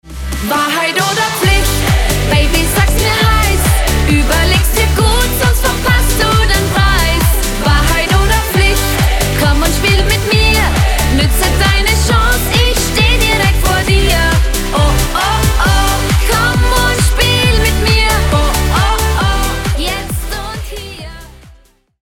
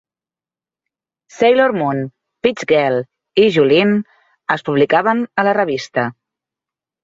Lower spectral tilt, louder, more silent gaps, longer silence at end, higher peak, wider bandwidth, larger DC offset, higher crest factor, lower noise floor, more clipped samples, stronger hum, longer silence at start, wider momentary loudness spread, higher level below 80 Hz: second, -4 dB/octave vs -6 dB/octave; first, -12 LUFS vs -16 LUFS; neither; second, 0.75 s vs 0.9 s; about the same, 0 dBFS vs -2 dBFS; first, 18.5 kHz vs 7.8 kHz; neither; second, 10 dB vs 16 dB; second, -45 dBFS vs under -90 dBFS; neither; neither; second, 0.05 s vs 1.35 s; second, 4 LU vs 10 LU; first, -14 dBFS vs -60 dBFS